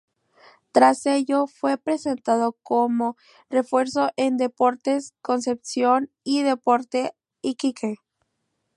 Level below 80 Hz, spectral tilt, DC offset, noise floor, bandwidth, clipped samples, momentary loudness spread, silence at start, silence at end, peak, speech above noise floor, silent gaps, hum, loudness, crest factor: -74 dBFS; -4 dB/octave; under 0.1%; -76 dBFS; 11.5 kHz; under 0.1%; 7 LU; 0.75 s; 0.8 s; -2 dBFS; 53 dB; none; none; -23 LUFS; 20 dB